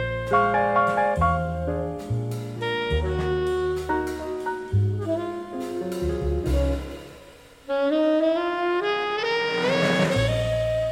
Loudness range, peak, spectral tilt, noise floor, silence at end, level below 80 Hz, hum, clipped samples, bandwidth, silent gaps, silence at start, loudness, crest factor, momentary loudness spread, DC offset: 4 LU; -8 dBFS; -6.5 dB/octave; -48 dBFS; 0 s; -36 dBFS; none; under 0.1%; 16.5 kHz; none; 0 s; -24 LUFS; 16 dB; 9 LU; under 0.1%